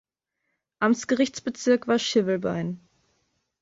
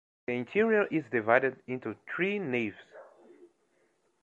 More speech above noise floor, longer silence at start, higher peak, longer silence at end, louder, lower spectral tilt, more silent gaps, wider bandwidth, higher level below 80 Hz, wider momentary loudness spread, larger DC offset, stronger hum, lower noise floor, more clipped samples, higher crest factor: first, 56 dB vs 42 dB; first, 0.8 s vs 0.3 s; about the same, -8 dBFS vs -8 dBFS; about the same, 0.85 s vs 0.75 s; first, -25 LUFS vs -30 LUFS; second, -4.5 dB/octave vs -7.5 dB/octave; neither; about the same, 7.8 kHz vs 7.4 kHz; first, -66 dBFS vs -76 dBFS; second, 8 LU vs 12 LU; neither; neither; first, -80 dBFS vs -72 dBFS; neither; second, 18 dB vs 24 dB